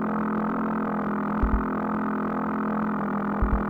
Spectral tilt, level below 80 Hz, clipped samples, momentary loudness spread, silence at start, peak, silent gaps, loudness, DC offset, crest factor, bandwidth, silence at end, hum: -10 dB/octave; -34 dBFS; under 0.1%; 2 LU; 0 s; -12 dBFS; none; -27 LUFS; under 0.1%; 14 dB; over 20 kHz; 0 s; none